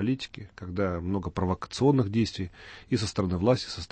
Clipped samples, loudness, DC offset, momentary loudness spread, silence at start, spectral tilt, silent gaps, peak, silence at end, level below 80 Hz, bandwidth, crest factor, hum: under 0.1%; -28 LUFS; under 0.1%; 14 LU; 0 s; -6.5 dB/octave; none; -10 dBFS; 0.05 s; -50 dBFS; 8.8 kHz; 18 dB; none